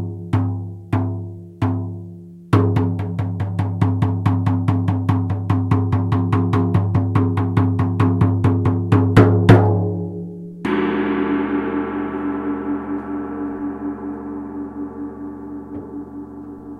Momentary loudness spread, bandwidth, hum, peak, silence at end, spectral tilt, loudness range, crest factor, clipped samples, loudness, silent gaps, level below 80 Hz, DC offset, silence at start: 15 LU; 5.2 kHz; none; 0 dBFS; 0 s; -9.5 dB/octave; 11 LU; 18 dB; under 0.1%; -19 LUFS; none; -44 dBFS; under 0.1%; 0 s